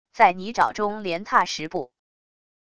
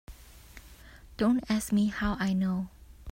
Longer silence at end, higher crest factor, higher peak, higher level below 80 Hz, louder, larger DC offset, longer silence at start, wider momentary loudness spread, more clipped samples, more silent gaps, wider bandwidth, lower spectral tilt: first, 0.75 s vs 0 s; first, 22 dB vs 16 dB; first, -2 dBFS vs -16 dBFS; second, -60 dBFS vs -48 dBFS; first, -23 LUFS vs -29 LUFS; first, 0.5% vs under 0.1%; about the same, 0.15 s vs 0.1 s; second, 12 LU vs 24 LU; neither; neither; second, 11 kHz vs 16 kHz; second, -3.5 dB/octave vs -6 dB/octave